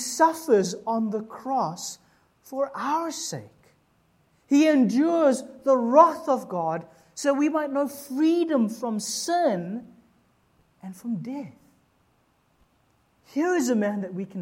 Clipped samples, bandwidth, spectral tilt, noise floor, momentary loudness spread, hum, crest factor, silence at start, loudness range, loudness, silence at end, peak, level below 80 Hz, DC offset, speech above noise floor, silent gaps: under 0.1%; 16.5 kHz; -5 dB/octave; -66 dBFS; 16 LU; none; 22 dB; 0 s; 11 LU; -24 LUFS; 0 s; -4 dBFS; -74 dBFS; under 0.1%; 42 dB; none